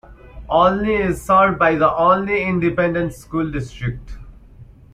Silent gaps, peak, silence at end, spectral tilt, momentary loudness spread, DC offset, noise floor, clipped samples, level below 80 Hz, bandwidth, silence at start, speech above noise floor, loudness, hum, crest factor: none; -2 dBFS; 0.3 s; -7 dB/octave; 11 LU; under 0.1%; -43 dBFS; under 0.1%; -38 dBFS; 15.5 kHz; 0.1 s; 25 dB; -18 LUFS; none; 16 dB